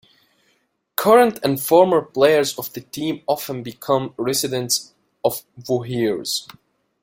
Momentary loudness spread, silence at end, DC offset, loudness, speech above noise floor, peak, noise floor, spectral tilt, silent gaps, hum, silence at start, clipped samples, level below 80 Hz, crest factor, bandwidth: 13 LU; 0.6 s; under 0.1%; -20 LUFS; 47 dB; 0 dBFS; -66 dBFS; -4 dB/octave; none; none; 1 s; under 0.1%; -62 dBFS; 20 dB; 16.5 kHz